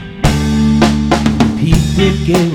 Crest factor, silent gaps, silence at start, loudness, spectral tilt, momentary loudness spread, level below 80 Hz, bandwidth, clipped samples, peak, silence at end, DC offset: 12 dB; none; 0 s; -12 LUFS; -6 dB/octave; 2 LU; -22 dBFS; 17 kHz; 0.1%; 0 dBFS; 0 s; under 0.1%